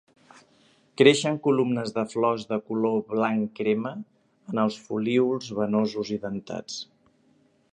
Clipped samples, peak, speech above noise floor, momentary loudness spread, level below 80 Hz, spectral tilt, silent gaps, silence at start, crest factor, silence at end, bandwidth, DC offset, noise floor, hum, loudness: under 0.1%; -4 dBFS; 39 dB; 15 LU; -70 dBFS; -5.5 dB/octave; none; 1 s; 24 dB; 0.9 s; 10 kHz; under 0.1%; -63 dBFS; none; -25 LUFS